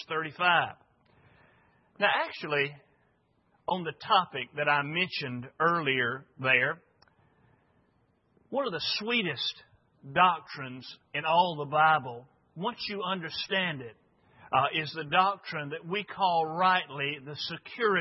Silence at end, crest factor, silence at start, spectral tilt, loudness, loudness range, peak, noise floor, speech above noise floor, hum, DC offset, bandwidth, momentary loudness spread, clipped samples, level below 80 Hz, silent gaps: 0 s; 22 dB; 0 s; -1.5 dB/octave; -29 LUFS; 4 LU; -8 dBFS; -70 dBFS; 41 dB; none; under 0.1%; 5.8 kHz; 11 LU; under 0.1%; -74 dBFS; none